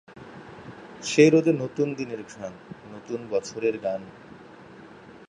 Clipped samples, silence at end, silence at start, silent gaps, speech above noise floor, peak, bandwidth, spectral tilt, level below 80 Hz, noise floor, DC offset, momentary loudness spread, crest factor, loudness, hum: under 0.1%; 0.1 s; 0.15 s; none; 22 dB; -4 dBFS; 10.5 kHz; -5.5 dB/octave; -66 dBFS; -47 dBFS; under 0.1%; 28 LU; 22 dB; -24 LUFS; none